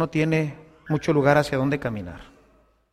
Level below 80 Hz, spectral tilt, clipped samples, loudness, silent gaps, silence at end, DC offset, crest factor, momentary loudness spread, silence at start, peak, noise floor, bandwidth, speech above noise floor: -52 dBFS; -7 dB/octave; under 0.1%; -23 LUFS; none; 0.7 s; under 0.1%; 20 dB; 16 LU; 0 s; -4 dBFS; -60 dBFS; 13.5 kHz; 37 dB